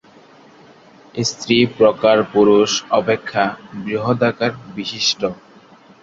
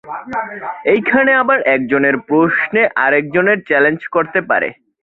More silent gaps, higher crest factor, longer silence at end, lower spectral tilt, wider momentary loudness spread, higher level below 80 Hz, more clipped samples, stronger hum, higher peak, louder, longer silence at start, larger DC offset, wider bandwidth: neither; about the same, 18 dB vs 14 dB; first, 0.7 s vs 0.3 s; second, -4 dB/octave vs -8.5 dB/octave; about the same, 12 LU vs 11 LU; about the same, -56 dBFS vs -58 dBFS; neither; neither; about the same, 0 dBFS vs -2 dBFS; second, -17 LUFS vs -14 LUFS; first, 1.15 s vs 0.05 s; neither; first, 7.8 kHz vs 4.2 kHz